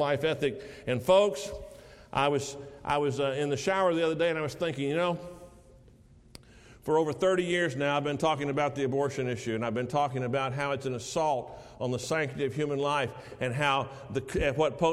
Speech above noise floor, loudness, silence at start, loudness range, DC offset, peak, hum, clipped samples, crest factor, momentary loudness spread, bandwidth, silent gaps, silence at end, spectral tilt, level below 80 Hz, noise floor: 27 dB; -29 LUFS; 0 s; 2 LU; under 0.1%; -10 dBFS; none; under 0.1%; 18 dB; 9 LU; 14.5 kHz; none; 0 s; -5 dB/octave; -54 dBFS; -56 dBFS